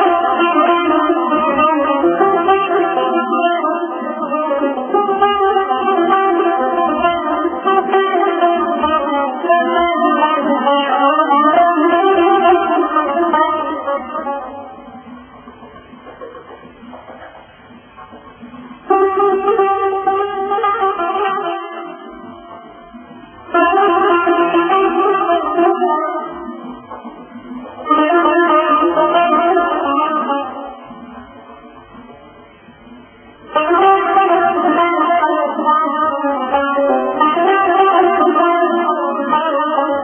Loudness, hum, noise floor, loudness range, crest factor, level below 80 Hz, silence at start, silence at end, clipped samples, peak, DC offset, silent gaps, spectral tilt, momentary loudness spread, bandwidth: -14 LUFS; none; -41 dBFS; 8 LU; 14 dB; -52 dBFS; 0 s; 0 s; under 0.1%; 0 dBFS; under 0.1%; none; -6.5 dB/octave; 19 LU; 3.5 kHz